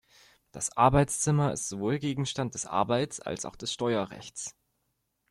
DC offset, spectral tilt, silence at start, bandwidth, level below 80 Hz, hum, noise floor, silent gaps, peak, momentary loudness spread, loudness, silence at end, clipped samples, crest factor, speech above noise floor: under 0.1%; -4.5 dB/octave; 0.55 s; 13 kHz; -52 dBFS; none; -78 dBFS; none; -8 dBFS; 15 LU; -29 LUFS; 0.8 s; under 0.1%; 22 dB; 49 dB